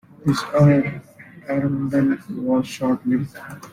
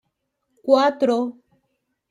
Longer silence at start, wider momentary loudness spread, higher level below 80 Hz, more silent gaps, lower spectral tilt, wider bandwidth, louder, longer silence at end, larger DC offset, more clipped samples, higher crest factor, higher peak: second, 0.25 s vs 0.65 s; first, 16 LU vs 13 LU; first, -54 dBFS vs -76 dBFS; neither; first, -7.5 dB/octave vs -4.5 dB/octave; first, 15 kHz vs 11 kHz; about the same, -21 LUFS vs -20 LUFS; second, 0 s vs 0.8 s; neither; neither; about the same, 16 dB vs 20 dB; about the same, -4 dBFS vs -4 dBFS